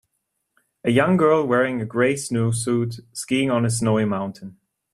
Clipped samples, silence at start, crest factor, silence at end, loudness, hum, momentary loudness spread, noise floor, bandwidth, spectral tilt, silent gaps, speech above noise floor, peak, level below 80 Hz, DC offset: under 0.1%; 0.85 s; 18 dB; 0.4 s; -21 LUFS; none; 11 LU; -76 dBFS; 13.5 kHz; -5.5 dB/octave; none; 55 dB; -4 dBFS; -58 dBFS; under 0.1%